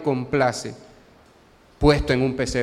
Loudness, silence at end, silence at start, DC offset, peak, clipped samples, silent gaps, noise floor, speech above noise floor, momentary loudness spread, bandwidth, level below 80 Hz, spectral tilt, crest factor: -21 LUFS; 0 s; 0 s; under 0.1%; -4 dBFS; under 0.1%; none; -53 dBFS; 33 dB; 10 LU; 14 kHz; -36 dBFS; -5.5 dB/octave; 20 dB